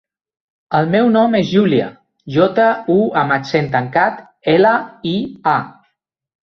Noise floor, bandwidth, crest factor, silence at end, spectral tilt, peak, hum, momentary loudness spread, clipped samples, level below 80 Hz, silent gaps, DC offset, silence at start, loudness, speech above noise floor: -68 dBFS; 6.4 kHz; 14 dB; 0.9 s; -7.5 dB/octave; -2 dBFS; none; 8 LU; under 0.1%; -56 dBFS; none; under 0.1%; 0.7 s; -15 LUFS; 54 dB